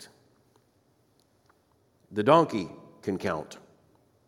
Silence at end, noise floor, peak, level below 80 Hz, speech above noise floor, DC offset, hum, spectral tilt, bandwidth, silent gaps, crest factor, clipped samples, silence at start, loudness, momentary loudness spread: 0.7 s; -67 dBFS; -6 dBFS; -70 dBFS; 42 dB; under 0.1%; none; -6.5 dB/octave; 15.5 kHz; none; 26 dB; under 0.1%; 0 s; -27 LUFS; 21 LU